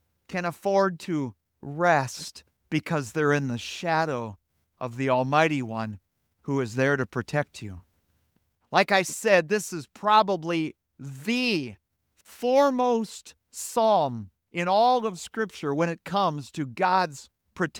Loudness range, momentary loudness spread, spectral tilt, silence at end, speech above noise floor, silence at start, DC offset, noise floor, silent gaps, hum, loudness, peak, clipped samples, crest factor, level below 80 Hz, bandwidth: 3 LU; 16 LU; -5 dB/octave; 0 s; 46 dB; 0.3 s; under 0.1%; -71 dBFS; none; none; -25 LUFS; -4 dBFS; under 0.1%; 22 dB; -68 dBFS; 19.5 kHz